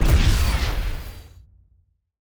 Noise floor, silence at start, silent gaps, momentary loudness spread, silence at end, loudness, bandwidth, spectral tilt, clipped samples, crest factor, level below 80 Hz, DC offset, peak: -62 dBFS; 0 s; none; 21 LU; 1 s; -23 LUFS; over 20 kHz; -5 dB/octave; under 0.1%; 16 dB; -22 dBFS; under 0.1%; -6 dBFS